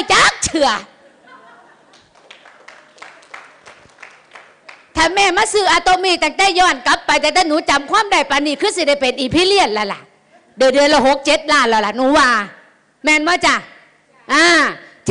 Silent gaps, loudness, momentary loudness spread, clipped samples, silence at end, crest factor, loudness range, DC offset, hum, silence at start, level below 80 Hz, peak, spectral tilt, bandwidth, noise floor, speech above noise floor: none; -13 LUFS; 7 LU; under 0.1%; 0 s; 12 dB; 7 LU; under 0.1%; none; 0 s; -44 dBFS; -4 dBFS; -2 dB/octave; 10.5 kHz; -50 dBFS; 37 dB